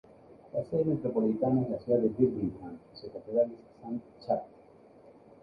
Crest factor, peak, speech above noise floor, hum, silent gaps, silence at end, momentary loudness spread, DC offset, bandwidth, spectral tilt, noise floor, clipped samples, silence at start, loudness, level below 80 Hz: 20 dB; -12 dBFS; 26 dB; none; none; 0.35 s; 17 LU; under 0.1%; 5.2 kHz; -11 dB/octave; -56 dBFS; under 0.1%; 0.3 s; -31 LUFS; -64 dBFS